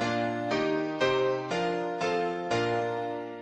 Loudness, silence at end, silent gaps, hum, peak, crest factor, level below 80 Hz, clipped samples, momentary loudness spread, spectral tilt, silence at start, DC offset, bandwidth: -29 LUFS; 0 s; none; none; -12 dBFS; 16 dB; -64 dBFS; under 0.1%; 4 LU; -5.5 dB/octave; 0 s; under 0.1%; 10 kHz